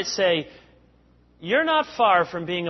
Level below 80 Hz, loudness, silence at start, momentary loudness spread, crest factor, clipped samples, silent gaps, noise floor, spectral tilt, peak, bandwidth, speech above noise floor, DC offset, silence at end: -60 dBFS; -21 LUFS; 0 s; 12 LU; 18 dB; under 0.1%; none; -57 dBFS; -3.5 dB/octave; -6 dBFS; 6.2 kHz; 35 dB; under 0.1%; 0 s